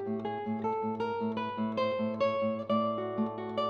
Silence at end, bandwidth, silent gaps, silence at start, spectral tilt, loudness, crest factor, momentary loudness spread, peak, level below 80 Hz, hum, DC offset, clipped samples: 0 s; 6.6 kHz; none; 0 s; -8 dB/octave; -32 LUFS; 14 dB; 4 LU; -18 dBFS; -70 dBFS; none; under 0.1%; under 0.1%